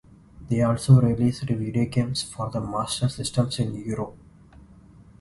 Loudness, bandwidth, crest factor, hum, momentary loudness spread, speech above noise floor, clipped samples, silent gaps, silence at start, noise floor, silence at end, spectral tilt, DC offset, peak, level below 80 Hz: -24 LUFS; 11.5 kHz; 20 dB; none; 12 LU; 27 dB; under 0.1%; none; 0.4 s; -50 dBFS; 1.05 s; -6.5 dB/octave; under 0.1%; -4 dBFS; -48 dBFS